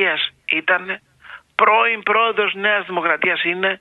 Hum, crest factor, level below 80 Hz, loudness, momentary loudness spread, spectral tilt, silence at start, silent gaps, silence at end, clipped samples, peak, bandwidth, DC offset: none; 18 dB; -68 dBFS; -17 LUFS; 7 LU; -5.5 dB/octave; 0 s; none; 0.05 s; under 0.1%; 0 dBFS; 5.4 kHz; under 0.1%